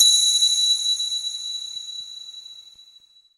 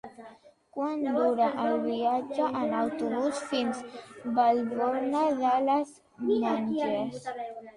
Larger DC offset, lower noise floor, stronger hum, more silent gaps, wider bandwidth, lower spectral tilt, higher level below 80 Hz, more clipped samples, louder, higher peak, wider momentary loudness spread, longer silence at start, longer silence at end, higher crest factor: neither; about the same, -53 dBFS vs -54 dBFS; neither; neither; first, 15.5 kHz vs 11.5 kHz; second, 5.5 dB/octave vs -5.5 dB/octave; about the same, -72 dBFS vs -72 dBFS; neither; first, -19 LUFS vs -28 LUFS; first, -2 dBFS vs -12 dBFS; first, 21 LU vs 12 LU; about the same, 0 s vs 0.05 s; first, 0.7 s vs 0.05 s; about the same, 20 dB vs 16 dB